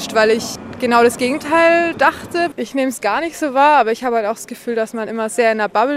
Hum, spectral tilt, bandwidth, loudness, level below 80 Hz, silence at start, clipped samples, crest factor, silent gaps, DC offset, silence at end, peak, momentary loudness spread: none; -3.5 dB/octave; 16 kHz; -16 LUFS; -56 dBFS; 0 s; under 0.1%; 14 dB; none; under 0.1%; 0 s; -2 dBFS; 10 LU